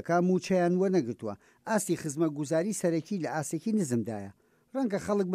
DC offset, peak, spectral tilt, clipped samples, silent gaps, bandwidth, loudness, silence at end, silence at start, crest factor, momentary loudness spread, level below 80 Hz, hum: under 0.1%; -14 dBFS; -6 dB/octave; under 0.1%; none; 15.5 kHz; -30 LUFS; 0 s; 0.05 s; 14 dB; 12 LU; -70 dBFS; none